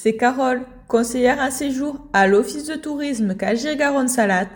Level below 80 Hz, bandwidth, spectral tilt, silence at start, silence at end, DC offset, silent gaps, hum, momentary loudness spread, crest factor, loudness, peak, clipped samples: -50 dBFS; 17.5 kHz; -4.5 dB/octave; 0 s; 0 s; under 0.1%; none; none; 9 LU; 16 dB; -20 LUFS; -4 dBFS; under 0.1%